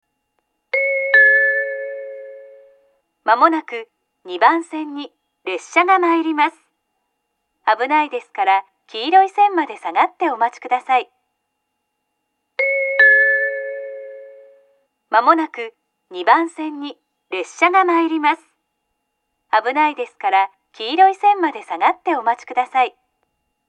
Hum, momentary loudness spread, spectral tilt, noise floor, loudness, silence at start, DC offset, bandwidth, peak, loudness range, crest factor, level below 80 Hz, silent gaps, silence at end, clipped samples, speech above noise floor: none; 18 LU; -1.5 dB/octave; -74 dBFS; -17 LUFS; 0.75 s; under 0.1%; 9.4 kHz; 0 dBFS; 3 LU; 18 dB; -84 dBFS; none; 0.8 s; under 0.1%; 57 dB